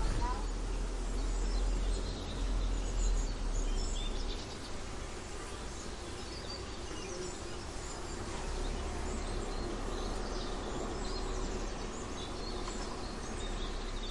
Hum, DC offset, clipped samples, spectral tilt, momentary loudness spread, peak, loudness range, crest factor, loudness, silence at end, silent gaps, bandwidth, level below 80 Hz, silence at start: none; under 0.1%; under 0.1%; -4.5 dB/octave; 6 LU; -22 dBFS; 5 LU; 14 dB; -40 LUFS; 0 s; none; 11.5 kHz; -38 dBFS; 0 s